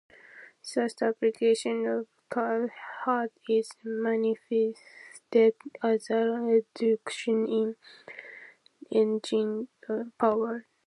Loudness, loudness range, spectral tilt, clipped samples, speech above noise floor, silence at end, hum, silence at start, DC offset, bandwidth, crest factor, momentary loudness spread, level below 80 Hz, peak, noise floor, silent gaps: -28 LUFS; 3 LU; -5 dB/octave; under 0.1%; 25 dB; 0.25 s; none; 0.35 s; under 0.1%; 11.5 kHz; 18 dB; 18 LU; -82 dBFS; -12 dBFS; -52 dBFS; none